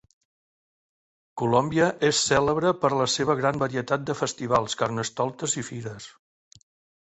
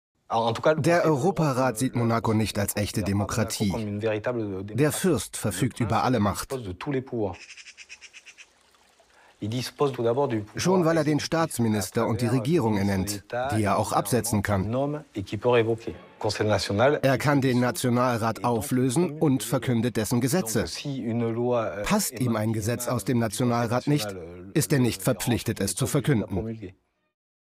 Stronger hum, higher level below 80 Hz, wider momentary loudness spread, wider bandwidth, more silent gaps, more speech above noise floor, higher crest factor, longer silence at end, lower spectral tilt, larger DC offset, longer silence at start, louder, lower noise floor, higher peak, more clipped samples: neither; about the same, -58 dBFS vs -54 dBFS; first, 13 LU vs 9 LU; second, 8.2 kHz vs 16 kHz; neither; first, over 65 dB vs 36 dB; about the same, 20 dB vs 18 dB; about the same, 0.9 s vs 0.85 s; second, -4 dB/octave vs -5.5 dB/octave; neither; first, 1.35 s vs 0.3 s; about the same, -24 LUFS vs -25 LUFS; first, under -90 dBFS vs -61 dBFS; about the same, -6 dBFS vs -8 dBFS; neither